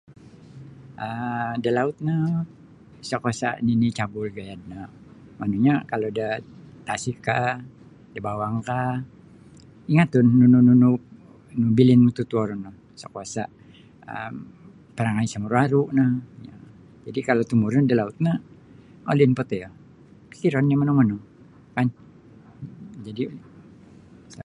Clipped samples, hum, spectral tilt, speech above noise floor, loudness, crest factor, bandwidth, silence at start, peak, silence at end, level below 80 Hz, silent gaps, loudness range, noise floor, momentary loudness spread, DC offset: under 0.1%; none; -7.5 dB/octave; 28 dB; -22 LUFS; 20 dB; 10.5 kHz; 0.55 s; -4 dBFS; 0 s; -58 dBFS; none; 9 LU; -49 dBFS; 22 LU; under 0.1%